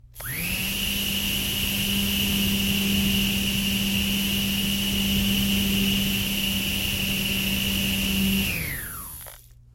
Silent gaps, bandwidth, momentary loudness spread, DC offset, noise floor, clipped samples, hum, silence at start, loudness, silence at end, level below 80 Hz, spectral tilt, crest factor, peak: none; 17 kHz; 6 LU; under 0.1%; -45 dBFS; under 0.1%; none; 0.05 s; -23 LUFS; 0.35 s; -38 dBFS; -3 dB/octave; 14 dB; -12 dBFS